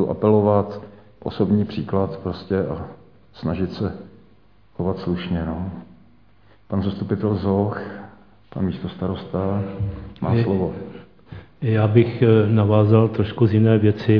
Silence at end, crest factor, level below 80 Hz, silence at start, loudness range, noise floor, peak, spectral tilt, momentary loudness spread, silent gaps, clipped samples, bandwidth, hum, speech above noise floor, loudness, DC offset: 0 s; 20 dB; -48 dBFS; 0 s; 9 LU; -55 dBFS; -2 dBFS; -11 dB/octave; 18 LU; none; under 0.1%; 5.2 kHz; none; 36 dB; -21 LUFS; 0.2%